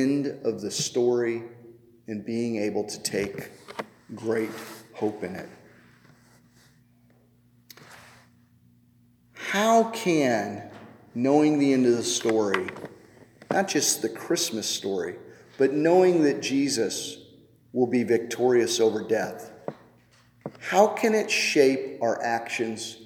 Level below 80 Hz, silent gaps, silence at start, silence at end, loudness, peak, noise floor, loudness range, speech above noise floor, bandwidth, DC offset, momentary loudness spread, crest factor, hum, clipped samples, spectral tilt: -72 dBFS; none; 0 s; 0 s; -25 LUFS; -6 dBFS; -60 dBFS; 11 LU; 36 dB; 18.5 kHz; under 0.1%; 19 LU; 22 dB; none; under 0.1%; -4 dB/octave